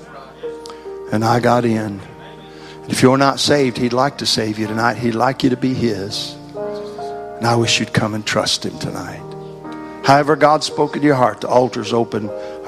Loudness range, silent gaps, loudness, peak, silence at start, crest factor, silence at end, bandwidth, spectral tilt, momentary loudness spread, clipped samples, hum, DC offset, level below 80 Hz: 3 LU; none; -17 LUFS; 0 dBFS; 0 s; 18 dB; 0 s; 14.5 kHz; -4.5 dB/octave; 18 LU; under 0.1%; none; under 0.1%; -50 dBFS